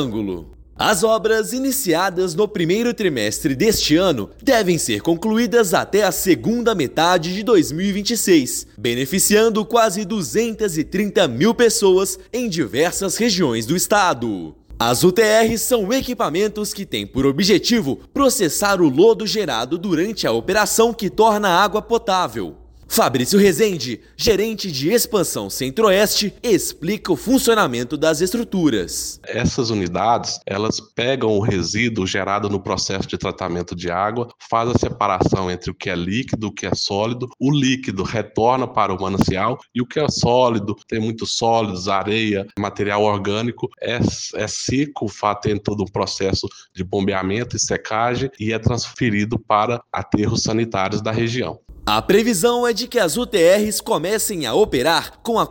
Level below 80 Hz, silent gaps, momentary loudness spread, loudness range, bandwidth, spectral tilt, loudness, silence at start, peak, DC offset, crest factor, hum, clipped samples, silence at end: -44 dBFS; none; 9 LU; 4 LU; 17 kHz; -4 dB/octave; -19 LUFS; 0 s; 0 dBFS; under 0.1%; 18 dB; none; under 0.1%; 0 s